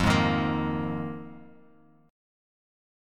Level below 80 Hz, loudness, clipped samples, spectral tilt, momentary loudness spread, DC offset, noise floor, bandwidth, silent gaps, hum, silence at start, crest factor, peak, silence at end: -48 dBFS; -28 LUFS; under 0.1%; -6 dB/octave; 17 LU; under 0.1%; -58 dBFS; 15 kHz; none; none; 0 s; 20 dB; -10 dBFS; 1 s